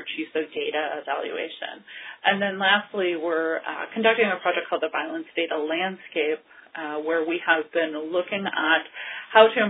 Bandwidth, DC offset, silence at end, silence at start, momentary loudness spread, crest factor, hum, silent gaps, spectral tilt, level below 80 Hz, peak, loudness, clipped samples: 4 kHz; under 0.1%; 0 s; 0 s; 12 LU; 24 dB; none; none; -7.5 dB/octave; -74 dBFS; 0 dBFS; -24 LUFS; under 0.1%